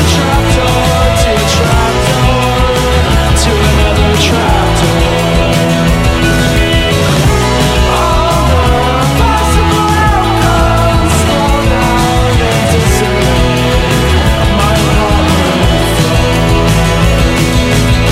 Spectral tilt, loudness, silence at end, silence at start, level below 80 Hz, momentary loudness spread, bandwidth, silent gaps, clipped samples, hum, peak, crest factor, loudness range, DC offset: -5 dB/octave; -9 LUFS; 0 s; 0 s; -14 dBFS; 1 LU; 16 kHz; none; under 0.1%; none; 0 dBFS; 8 dB; 0 LU; under 0.1%